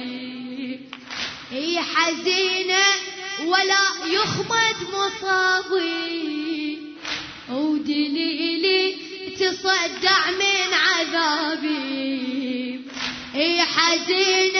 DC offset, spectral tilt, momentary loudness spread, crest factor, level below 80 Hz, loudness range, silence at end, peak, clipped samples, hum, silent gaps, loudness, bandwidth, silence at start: under 0.1%; -2 dB/octave; 13 LU; 20 dB; -64 dBFS; 4 LU; 0 s; -2 dBFS; under 0.1%; none; none; -21 LUFS; 6.6 kHz; 0 s